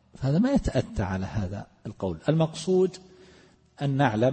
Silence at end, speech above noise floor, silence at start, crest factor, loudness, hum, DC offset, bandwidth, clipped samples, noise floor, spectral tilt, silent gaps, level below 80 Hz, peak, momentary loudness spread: 0 s; 31 dB; 0.2 s; 16 dB; -27 LUFS; none; under 0.1%; 8.8 kHz; under 0.1%; -56 dBFS; -7 dB/octave; none; -44 dBFS; -10 dBFS; 11 LU